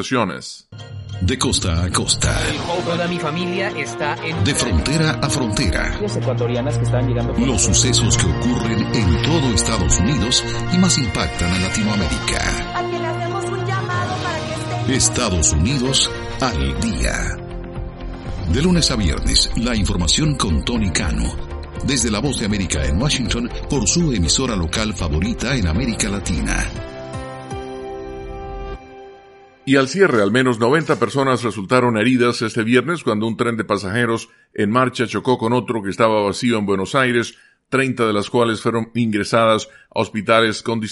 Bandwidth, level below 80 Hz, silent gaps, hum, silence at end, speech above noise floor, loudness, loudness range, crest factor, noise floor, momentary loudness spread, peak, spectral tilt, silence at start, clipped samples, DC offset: 11.5 kHz; -30 dBFS; none; none; 0 s; 27 dB; -18 LUFS; 4 LU; 18 dB; -45 dBFS; 12 LU; 0 dBFS; -4 dB/octave; 0 s; under 0.1%; under 0.1%